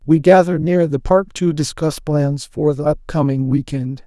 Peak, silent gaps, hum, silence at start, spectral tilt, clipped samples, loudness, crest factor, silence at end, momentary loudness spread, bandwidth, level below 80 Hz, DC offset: 0 dBFS; none; none; 0.05 s; -7 dB/octave; under 0.1%; -17 LUFS; 16 dB; 0.1 s; 8 LU; 12 kHz; -38 dBFS; under 0.1%